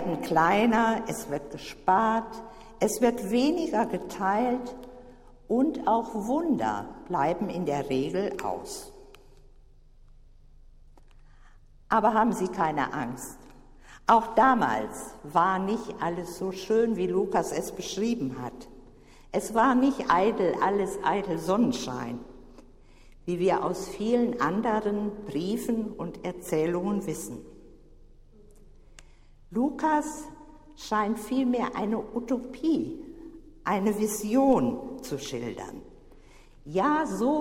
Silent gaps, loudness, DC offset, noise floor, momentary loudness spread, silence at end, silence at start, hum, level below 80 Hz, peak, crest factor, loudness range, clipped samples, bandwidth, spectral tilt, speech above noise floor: none; -27 LUFS; under 0.1%; -53 dBFS; 15 LU; 0 s; 0 s; none; -52 dBFS; -8 dBFS; 20 dB; 7 LU; under 0.1%; 16 kHz; -5.5 dB/octave; 26 dB